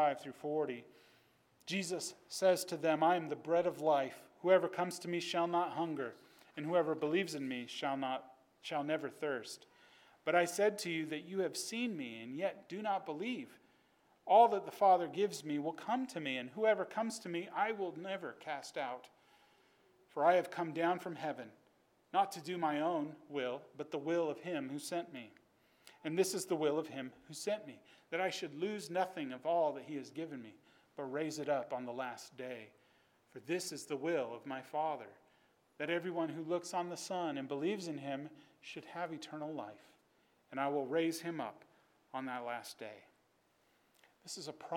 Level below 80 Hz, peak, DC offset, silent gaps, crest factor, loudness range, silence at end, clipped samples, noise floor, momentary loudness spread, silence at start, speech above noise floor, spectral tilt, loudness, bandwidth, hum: -90 dBFS; -16 dBFS; under 0.1%; none; 22 dB; 8 LU; 0 s; under 0.1%; -75 dBFS; 15 LU; 0 s; 37 dB; -4.5 dB/octave; -38 LUFS; 18 kHz; none